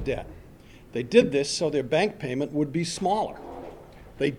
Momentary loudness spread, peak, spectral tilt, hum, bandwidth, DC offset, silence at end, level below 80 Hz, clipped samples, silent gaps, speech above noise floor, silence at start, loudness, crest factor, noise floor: 19 LU; -6 dBFS; -5 dB/octave; none; 13 kHz; under 0.1%; 0 s; -50 dBFS; under 0.1%; none; 24 dB; 0 s; -26 LUFS; 22 dB; -49 dBFS